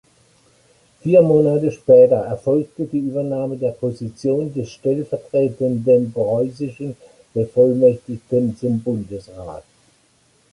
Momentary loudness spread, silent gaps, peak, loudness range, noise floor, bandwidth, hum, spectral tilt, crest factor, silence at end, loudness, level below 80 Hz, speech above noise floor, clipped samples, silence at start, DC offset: 15 LU; none; -2 dBFS; 5 LU; -58 dBFS; 11 kHz; none; -9 dB/octave; 16 dB; 0.9 s; -18 LUFS; -54 dBFS; 41 dB; under 0.1%; 1.05 s; under 0.1%